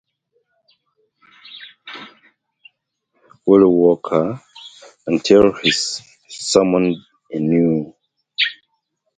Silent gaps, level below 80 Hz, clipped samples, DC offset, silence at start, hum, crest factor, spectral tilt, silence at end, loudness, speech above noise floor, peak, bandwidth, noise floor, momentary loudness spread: none; -54 dBFS; under 0.1%; under 0.1%; 1.5 s; none; 20 dB; -4.5 dB/octave; 0.65 s; -16 LUFS; 56 dB; 0 dBFS; 9.4 kHz; -71 dBFS; 24 LU